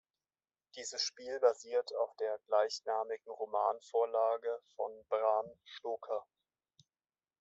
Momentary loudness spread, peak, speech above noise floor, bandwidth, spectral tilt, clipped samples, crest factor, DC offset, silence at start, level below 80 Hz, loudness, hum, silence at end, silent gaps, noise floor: 10 LU; -16 dBFS; over 54 dB; 8.2 kHz; -0.5 dB/octave; under 0.1%; 22 dB; under 0.1%; 0.75 s; -90 dBFS; -36 LUFS; none; 1.2 s; none; under -90 dBFS